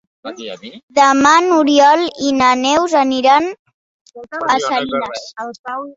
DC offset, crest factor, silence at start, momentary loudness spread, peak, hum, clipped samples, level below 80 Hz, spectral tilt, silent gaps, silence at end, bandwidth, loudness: under 0.1%; 14 dB; 0.25 s; 19 LU; -2 dBFS; none; under 0.1%; -56 dBFS; -2.5 dB/octave; 0.83-0.88 s, 3.59-3.65 s, 3.74-4.06 s, 5.59-5.64 s; 0.05 s; 8 kHz; -13 LUFS